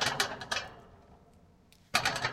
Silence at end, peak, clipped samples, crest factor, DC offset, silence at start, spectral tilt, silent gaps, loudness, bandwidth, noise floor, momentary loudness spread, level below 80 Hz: 0 s; -10 dBFS; under 0.1%; 26 dB; under 0.1%; 0 s; -1.5 dB/octave; none; -32 LUFS; 16.5 kHz; -61 dBFS; 17 LU; -62 dBFS